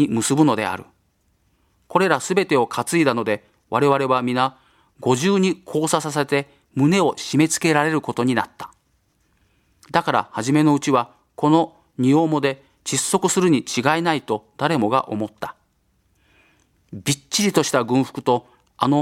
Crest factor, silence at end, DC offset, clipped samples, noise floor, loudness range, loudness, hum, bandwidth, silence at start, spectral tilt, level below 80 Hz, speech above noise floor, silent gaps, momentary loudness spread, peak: 20 dB; 0 s; under 0.1%; under 0.1%; -65 dBFS; 4 LU; -20 LUFS; none; 16.5 kHz; 0 s; -4.5 dB/octave; -62 dBFS; 45 dB; none; 10 LU; 0 dBFS